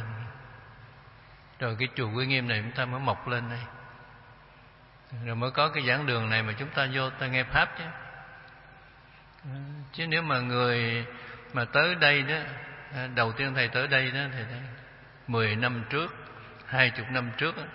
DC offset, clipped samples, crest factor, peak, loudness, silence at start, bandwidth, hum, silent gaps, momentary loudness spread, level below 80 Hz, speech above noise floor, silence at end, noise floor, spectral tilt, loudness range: under 0.1%; under 0.1%; 26 dB; -4 dBFS; -28 LUFS; 0 s; 5.8 kHz; none; none; 20 LU; -58 dBFS; 26 dB; 0 s; -54 dBFS; -9 dB/octave; 5 LU